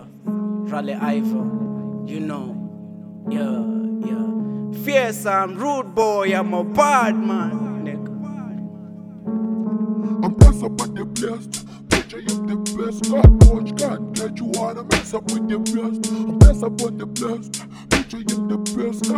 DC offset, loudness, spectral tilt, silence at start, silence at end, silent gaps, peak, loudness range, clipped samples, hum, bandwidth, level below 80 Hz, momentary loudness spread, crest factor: under 0.1%; -20 LUFS; -6 dB/octave; 0 s; 0 s; none; 0 dBFS; 7 LU; under 0.1%; none; 14.5 kHz; -24 dBFS; 17 LU; 18 dB